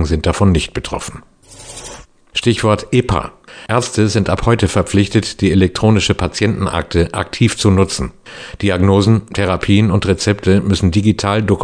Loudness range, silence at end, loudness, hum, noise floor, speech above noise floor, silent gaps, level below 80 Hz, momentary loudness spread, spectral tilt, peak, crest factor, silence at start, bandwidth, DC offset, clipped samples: 3 LU; 0 s; -15 LUFS; none; -36 dBFS; 22 dB; none; -32 dBFS; 13 LU; -6 dB/octave; 0 dBFS; 14 dB; 0 s; 10 kHz; under 0.1%; under 0.1%